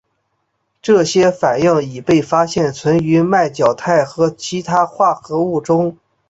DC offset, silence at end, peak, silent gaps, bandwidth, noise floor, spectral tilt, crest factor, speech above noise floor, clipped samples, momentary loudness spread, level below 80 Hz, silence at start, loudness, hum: under 0.1%; 0.35 s; 0 dBFS; none; 8 kHz; -68 dBFS; -6 dB/octave; 14 dB; 54 dB; under 0.1%; 5 LU; -52 dBFS; 0.85 s; -15 LUFS; none